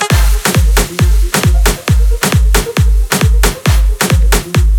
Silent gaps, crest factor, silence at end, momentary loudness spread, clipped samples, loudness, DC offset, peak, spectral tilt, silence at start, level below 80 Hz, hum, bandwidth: none; 10 dB; 0 s; 2 LU; under 0.1%; -12 LUFS; under 0.1%; 0 dBFS; -4.5 dB/octave; 0 s; -12 dBFS; none; 19.5 kHz